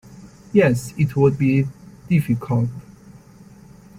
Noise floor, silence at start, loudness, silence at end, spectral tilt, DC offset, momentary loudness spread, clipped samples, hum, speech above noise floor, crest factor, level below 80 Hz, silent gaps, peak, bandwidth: -45 dBFS; 0.1 s; -20 LUFS; 1.2 s; -8 dB/octave; under 0.1%; 8 LU; under 0.1%; none; 27 dB; 18 dB; -50 dBFS; none; -2 dBFS; 15.5 kHz